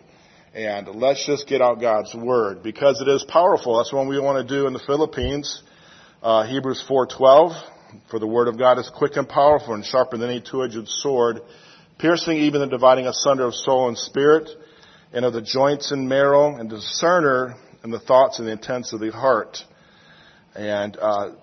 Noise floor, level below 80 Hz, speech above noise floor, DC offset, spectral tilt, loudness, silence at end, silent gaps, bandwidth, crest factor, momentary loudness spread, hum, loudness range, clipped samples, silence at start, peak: -52 dBFS; -52 dBFS; 33 dB; under 0.1%; -4.5 dB/octave; -20 LUFS; 0.1 s; none; 6.4 kHz; 20 dB; 12 LU; none; 4 LU; under 0.1%; 0.55 s; 0 dBFS